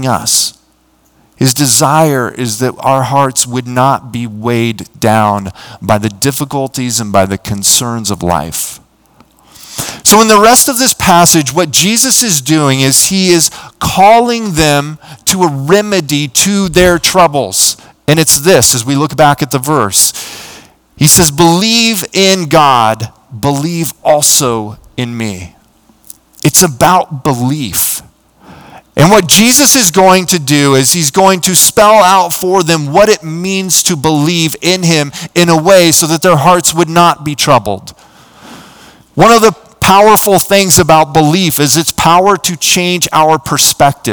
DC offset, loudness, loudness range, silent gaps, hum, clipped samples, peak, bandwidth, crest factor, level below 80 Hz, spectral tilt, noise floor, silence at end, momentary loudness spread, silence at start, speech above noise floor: under 0.1%; -8 LUFS; 6 LU; none; none; 4%; 0 dBFS; over 20 kHz; 10 dB; -38 dBFS; -3.5 dB/octave; -51 dBFS; 0 s; 11 LU; 0 s; 42 dB